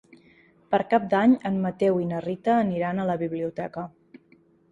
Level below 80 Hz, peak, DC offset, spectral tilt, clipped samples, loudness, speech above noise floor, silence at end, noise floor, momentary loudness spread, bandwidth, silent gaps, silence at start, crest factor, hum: -64 dBFS; -8 dBFS; under 0.1%; -8.5 dB/octave; under 0.1%; -25 LUFS; 35 dB; 0.8 s; -59 dBFS; 12 LU; 7.6 kHz; none; 0.7 s; 18 dB; none